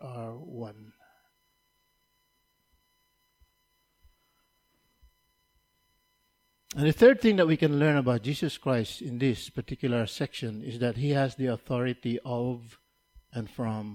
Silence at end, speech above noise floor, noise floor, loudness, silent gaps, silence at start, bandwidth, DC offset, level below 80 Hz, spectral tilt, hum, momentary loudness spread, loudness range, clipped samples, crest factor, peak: 0 s; 46 dB; -73 dBFS; -27 LUFS; none; 0 s; 16.5 kHz; under 0.1%; -60 dBFS; -7 dB/octave; none; 18 LU; 7 LU; under 0.1%; 24 dB; -6 dBFS